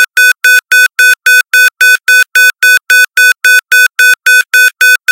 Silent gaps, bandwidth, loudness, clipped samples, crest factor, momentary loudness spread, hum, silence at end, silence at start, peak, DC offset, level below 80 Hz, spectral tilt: none; over 20 kHz; -5 LUFS; 4%; 6 dB; 2 LU; none; 0 s; 0 s; 0 dBFS; under 0.1%; -62 dBFS; 4.5 dB/octave